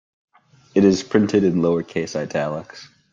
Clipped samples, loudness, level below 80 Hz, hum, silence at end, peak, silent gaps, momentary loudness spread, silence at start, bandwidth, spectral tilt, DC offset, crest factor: under 0.1%; -20 LUFS; -56 dBFS; none; 0.3 s; -2 dBFS; none; 10 LU; 0.75 s; 7.6 kHz; -6.5 dB/octave; under 0.1%; 18 dB